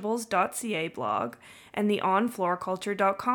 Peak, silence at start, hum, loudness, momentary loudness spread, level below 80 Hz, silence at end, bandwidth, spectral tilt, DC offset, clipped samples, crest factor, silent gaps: -12 dBFS; 0 s; none; -28 LUFS; 7 LU; -70 dBFS; 0 s; 19 kHz; -4.5 dB/octave; under 0.1%; under 0.1%; 16 dB; none